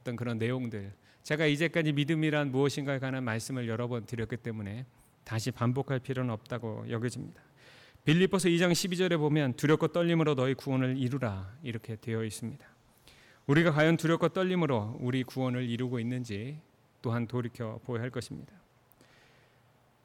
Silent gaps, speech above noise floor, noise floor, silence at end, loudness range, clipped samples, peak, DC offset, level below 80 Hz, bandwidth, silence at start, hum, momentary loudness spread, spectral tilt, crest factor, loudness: none; 34 dB; -65 dBFS; 1.6 s; 7 LU; under 0.1%; -16 dBFS; under 0.1%; -66 dBFS; 16.5 kHz; 0.05 s; none; 14 LU; -6 dB/octave; 16 dB; -31 LUFS